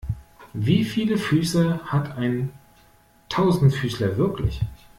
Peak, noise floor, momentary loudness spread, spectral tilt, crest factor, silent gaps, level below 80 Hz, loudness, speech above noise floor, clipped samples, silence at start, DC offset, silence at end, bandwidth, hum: -6 dBFS; -56 dBFS; 11 LU; -7 dB/octave; 16 dB; none; -42 dBFS; -23 LUFS; 34 dB; under 0.1%; 0.05 s; under 0.1%; 0.25 s; 16 kHz; none